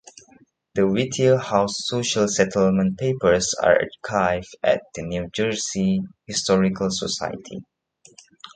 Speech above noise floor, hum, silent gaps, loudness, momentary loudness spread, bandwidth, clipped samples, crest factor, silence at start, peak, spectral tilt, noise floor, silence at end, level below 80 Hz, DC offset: 34 dB; none; none; -22 LUFS; 9 LU; 9.4 kHz; under 0.1%; 20 dB; 0.75 s; -2 dBFS; -4.5 dB/octave; -56 dBFS; 0.1 s; -50 dBFS; under 0.1%